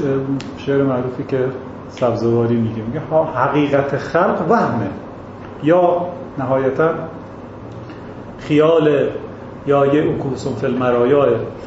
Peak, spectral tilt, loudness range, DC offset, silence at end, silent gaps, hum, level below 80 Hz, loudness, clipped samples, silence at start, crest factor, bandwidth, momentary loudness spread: -2 dBFS; -8 dB/octave; 3 LU; under 0.1%; 0 s; none; none; -48 dBFS; -17 LUFS; under 0.1%; 0 s; 16 dB; 8 kHz; 19 LU